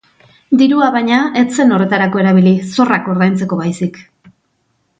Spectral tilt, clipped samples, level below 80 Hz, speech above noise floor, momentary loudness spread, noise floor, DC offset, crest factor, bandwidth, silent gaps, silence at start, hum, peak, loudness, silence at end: -6.5 dB/octave; under 0.1%; -58 dBFS; 51 dB; 7 LU; -63 dBFS; under 0.1%; 12 dB; 9 kHz; none; 0.5 s; none; 0 dBFS; -12 LUFS; 1 s